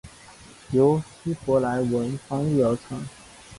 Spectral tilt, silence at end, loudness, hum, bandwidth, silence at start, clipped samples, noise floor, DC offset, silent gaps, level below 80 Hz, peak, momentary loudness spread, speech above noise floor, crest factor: -7.5 dB/octave; 0 s; -24 LUFS; none; 11.5 kHz; 0.05 s; under 0.1%; -48 dBFS; under 0.1%; none; -54 dBFS; -8 dBFS; 13 LU; 24 dB; 18 dB